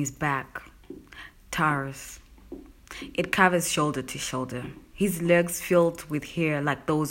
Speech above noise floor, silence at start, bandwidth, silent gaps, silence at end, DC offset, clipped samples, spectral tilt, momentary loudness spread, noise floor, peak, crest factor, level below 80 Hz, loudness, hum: 21 dB; 0 s; 16.5 kHz; none; 0 s; under 0.1%; under 0.1%; -4.5 dB/octave; 23 LU; -47 dBFS; -4 dBFS; 24 dB; -54 dBFS; -26 LUFS; none